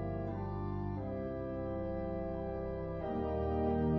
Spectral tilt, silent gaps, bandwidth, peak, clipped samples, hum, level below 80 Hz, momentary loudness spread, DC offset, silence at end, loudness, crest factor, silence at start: -9 dB/octave; none; 5.8 kHz; -22 dBFS; under 0.1%; none; -46 dBFS; 5 LU; under 0.1%; 0 s; -38 LUFS; 14 dB; 0 s